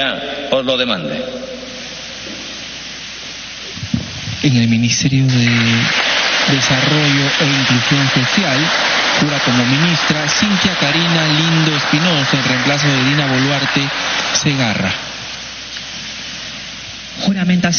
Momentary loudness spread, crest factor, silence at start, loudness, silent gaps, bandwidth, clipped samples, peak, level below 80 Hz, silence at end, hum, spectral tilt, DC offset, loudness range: 14 LU; 16 dB; 0 s; -14 LUFS; none; 6.8 kHz; under 0.1%; 0 dBFS; -46 dBFS; 0 s; none; -3 dB/octave; under 0.1%; 8 LU